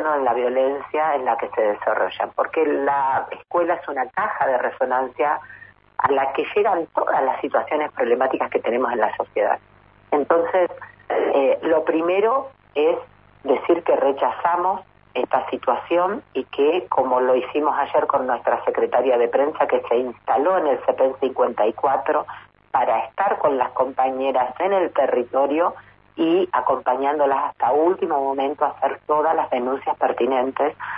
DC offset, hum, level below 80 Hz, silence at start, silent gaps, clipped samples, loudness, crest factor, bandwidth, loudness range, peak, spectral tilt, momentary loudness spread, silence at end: under 0.1%; none; -64 dBFS; 0 s; none; under 0.1%; -21 LUFS; 16 dB; 4.9 kHz; 2 LU; -4 dBFS; -9 dB/octave; 5 LU; 0 s